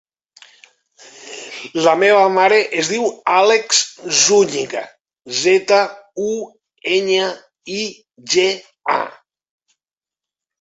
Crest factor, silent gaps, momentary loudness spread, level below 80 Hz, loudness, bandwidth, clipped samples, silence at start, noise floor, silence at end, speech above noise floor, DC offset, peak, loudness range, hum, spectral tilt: 18 dB; 5.01-5.05 s; 17 LU; -66 dBFS; -16 LUFS; 8.4 kHz; under 0.1%; 1.2 s; -90 dBFS; 1.5 s; 74 dB; under 0.1%; 0 dBFS; 6 LU; none; -2 dB/octave